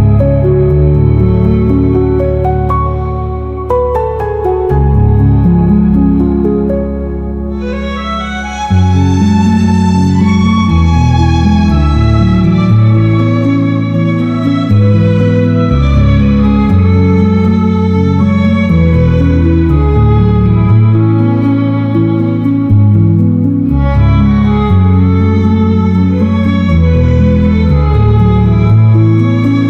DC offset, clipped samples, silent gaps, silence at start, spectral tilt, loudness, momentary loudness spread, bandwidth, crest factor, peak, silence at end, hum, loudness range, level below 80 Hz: under 0.1%; under 0.1%; none; 0 s; -9 dB/octave; -10 LUFS; 5 LU; 7 kHz; 8 dB; -2 dBFS; 0 s; none; 3 LU; -18 dBFS